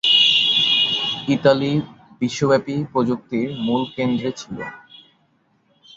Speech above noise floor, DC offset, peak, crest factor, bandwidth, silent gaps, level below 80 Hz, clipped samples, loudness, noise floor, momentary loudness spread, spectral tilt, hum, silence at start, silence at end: 42 dB; under 0.1%; -2 dBFS; 18 dB; 7.8 kHz; none; -60 dBFS; under 0.1%; -18 LUFS; -62 dBFS; 16 LU; -4.5 dB/octave; none; 0.05 s; 1.2 s